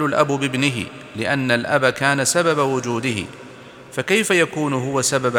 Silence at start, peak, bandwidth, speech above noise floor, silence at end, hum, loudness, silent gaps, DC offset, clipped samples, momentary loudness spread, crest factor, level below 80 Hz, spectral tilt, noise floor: 0 s; 0 dBFS; 18.5 kHz; 21 dB; 0 s; none; -19 LUFS; none; under 0.1%; under 0.1%; 12 LU; 20 dB; -60 dBFS; -4 dB/octave; -40 dBFS